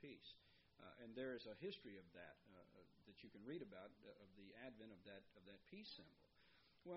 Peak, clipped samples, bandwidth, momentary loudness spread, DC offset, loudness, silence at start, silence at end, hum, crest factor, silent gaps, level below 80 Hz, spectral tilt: -40 dBFS; under 0.1%; 5.6 kHz; 14 LU; under 0.1%; -59 LUFS; 0 s; 0 s; none; 20 dB; none; -86 dBFS; -3.5 dB/octave